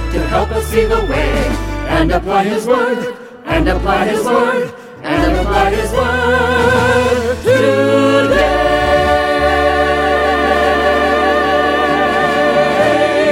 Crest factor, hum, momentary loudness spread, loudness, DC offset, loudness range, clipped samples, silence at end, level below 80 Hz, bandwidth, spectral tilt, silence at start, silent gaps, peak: 12 dB; none; 5 LU; -13 LUFS; under 0.1%; 3 LU; under 0.1%; 0 s; -24 dBFS; 16.5 kHz; -5.5 dB/octave; 0 s; none; 0 dBFS